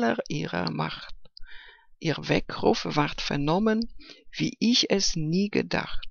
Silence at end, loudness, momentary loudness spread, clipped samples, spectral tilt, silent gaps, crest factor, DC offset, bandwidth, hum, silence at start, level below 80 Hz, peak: 0 s; -26 LUFS; 11 LU; under 0.1%; -4.5 dB/octave; none; 20 dB; under 0.1%; 7.4 kHz; none; 0 s; -44 dBFS; -8 dBFS